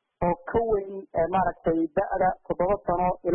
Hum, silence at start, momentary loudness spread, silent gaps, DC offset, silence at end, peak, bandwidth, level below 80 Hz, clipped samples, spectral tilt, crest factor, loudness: none; 0.2 s; 4 LU; none; under 0.1%; 0 s; -12 dBFS; 3.4 kHz; -44 dBFS; under 0.1%; -12 dB/octave; 14 dB; -26 LUFS